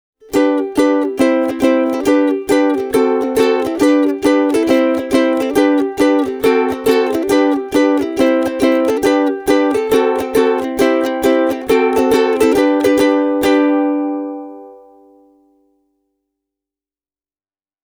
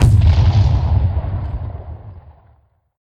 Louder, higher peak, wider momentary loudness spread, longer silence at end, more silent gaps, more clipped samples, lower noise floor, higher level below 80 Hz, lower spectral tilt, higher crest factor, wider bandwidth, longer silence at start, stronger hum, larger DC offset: about the same, -14 LUFS vs -16 LUFS; about the same, 0 dBFS vs 0 dBFS; second, 2 LU vs 20 LU; first, 3.1 s vs 0.85 s; neither; neither; first, under -90 dBFS vs -54 dBFS; second, -48 dBFS vs -20 dBFS; second, -4.5 dB/octave vs -7.5 dB/octave; about the same, 14 dB vs 16 dB; first, over 20 kHz vs 9.8 kHz; first, 0.3 s vs 0 s; neither; neither